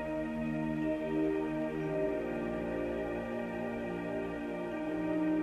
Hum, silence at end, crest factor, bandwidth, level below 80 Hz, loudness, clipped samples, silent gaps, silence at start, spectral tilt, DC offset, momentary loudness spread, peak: none; 0 s; 12 dB; 10.5 kHz; -56 dBFS; -35 LUFS; under 0.1%; none; 0 s; -8 dB/octave; under 0.1%; 5 LU; -22 dBFS